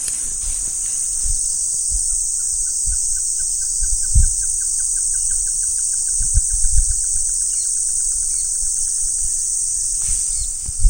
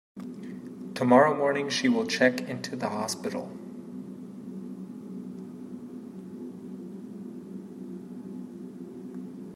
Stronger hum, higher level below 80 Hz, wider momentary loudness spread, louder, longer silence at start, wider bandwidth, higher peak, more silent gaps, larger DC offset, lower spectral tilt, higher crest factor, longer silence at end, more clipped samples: neither; first, -26 dBFS vs -76 dBFS; second, 2 LU vs 18 LU; first, -17 LUFS vs -27 LUFS; second, 0 s vs 0.15 s; about the same, 16.5 kHz vs 15 kHz; first, 0 dBFS vs -6 dBFS; neither; neither; second, 0 dB/octave vs -4.5 dB/octave; second, 18 dB vs 24 dB; about the same, 0 s vs 0 s; neither